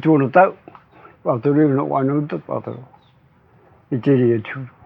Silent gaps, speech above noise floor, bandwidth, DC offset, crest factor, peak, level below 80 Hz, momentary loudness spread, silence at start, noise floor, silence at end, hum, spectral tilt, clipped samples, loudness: none; 36 dB; 4.9 kHz; under 0.1%; 20 dB; 0 dBFS; -68 dBFS; 13 LU; 0 s; -54 dBFS; 0.2 s; none; -11.5 dB/octave; under 0.1%; -18 LUFS